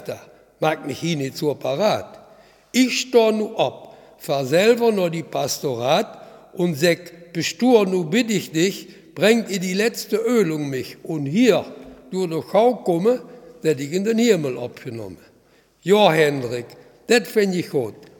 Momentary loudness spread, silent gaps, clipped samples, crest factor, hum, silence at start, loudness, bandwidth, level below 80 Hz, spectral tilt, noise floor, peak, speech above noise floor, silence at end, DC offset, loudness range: 15 LU; none; under 0.1%; 20 dB; none; 0 s; -20 LUFS; 19 kHz; -66 dBFS; -5 dB/octave; -56 dBFS; 0 dBFS; 37 dB; 0.15 s; under 0.1%; 2 LU